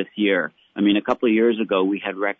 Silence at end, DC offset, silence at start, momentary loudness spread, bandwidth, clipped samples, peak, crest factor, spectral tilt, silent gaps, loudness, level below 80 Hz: 0.05 s; under 0.1%; 0 s; 5 LU; 6.2 kHz; under 0.1%; -6 dBFS; 14 dB; -7.5 dB/octave; none; -21 LUFS; -64 dBFS